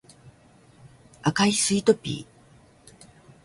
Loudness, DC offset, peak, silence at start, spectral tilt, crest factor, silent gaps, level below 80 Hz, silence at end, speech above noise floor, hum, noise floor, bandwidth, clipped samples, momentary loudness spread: -23 LUFS; under 0.1%; -6 dBFS; 0.25 s; -4 dB/octave; 22 dB; none; -60 dBFS; 1.2 s; 33 dB; none; -55 dBFS; 11.5 kHz; under 0.1%; 12 LU